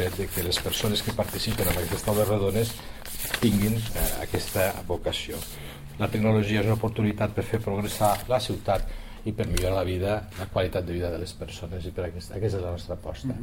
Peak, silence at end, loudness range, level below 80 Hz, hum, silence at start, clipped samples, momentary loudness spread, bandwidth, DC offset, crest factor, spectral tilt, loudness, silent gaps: -8 dBFS; 0 s; 4 LU; -38 dBFS; none; 0 s; under 0.1%; 11 LU; 17 kHz; under 0.1%; 18 dB; -5 dB/octave; -27 LUFS; none